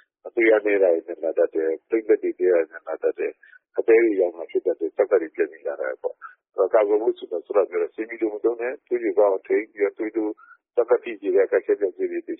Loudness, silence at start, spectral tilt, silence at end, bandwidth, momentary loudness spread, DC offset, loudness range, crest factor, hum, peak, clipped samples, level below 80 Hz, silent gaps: -23 LUFS; 0.25 s; 2.5 dB/octave; 0.05 s; 3.8 kHz; 11 LU; under 0.1%; 2 LU; 16 dB; none; -6 dBFS; under 0.1%; -76 dBFS; none